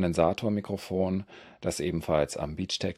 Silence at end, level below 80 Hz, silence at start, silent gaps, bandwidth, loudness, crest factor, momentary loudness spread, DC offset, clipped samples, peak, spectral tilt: 0.05 s; -54 dBFS; 0 s; none; 15 kHz; -30 LUFS; 20 dB; 8 LU; under 0.1%; under 0.1%; -10 dBFS; -5.5 dB/octave